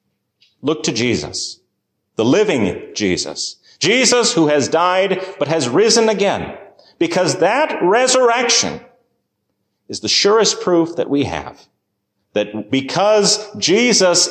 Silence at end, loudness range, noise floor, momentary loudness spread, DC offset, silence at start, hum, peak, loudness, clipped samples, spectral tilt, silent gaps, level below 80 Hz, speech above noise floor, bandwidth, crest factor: 0 s; 3 LU; -72 dBFS; 12 LU; under 0.1%; 0.65 s; none; -2 dBFS; -15 LUFS; under 0.1%; -3 dB/octave; none; -50 dBFS; 56 dB; 14.5 kHz; 14 dB